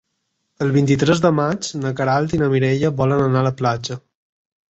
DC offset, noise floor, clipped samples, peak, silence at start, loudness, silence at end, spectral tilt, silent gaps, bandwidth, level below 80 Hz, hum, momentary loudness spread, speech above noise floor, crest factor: under 0.1%; -72 dBFS; under 0.1%; -2 dBFS; 0.6 s; -18 LUFS; 0.7 s; -6.5 dB/octave; none; 8.2 kHz; -48 dBFS; none; 8 LU; 55 dB; 16 dB